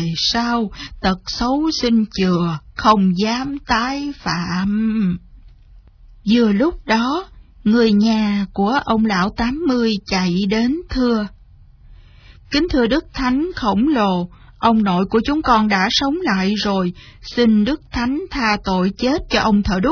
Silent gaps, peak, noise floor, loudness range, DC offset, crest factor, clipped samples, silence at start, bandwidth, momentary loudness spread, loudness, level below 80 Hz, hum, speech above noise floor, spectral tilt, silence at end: none; 0 dBFS; -45 dBFS; 3 LU; under 0.1%; 16 dB; under 0.1%; 0 s; 5.4 kHz; 7 LU; -18 LUFS; -38 dBFS; none; 28 dB; -5.5 dB/octave; 0 s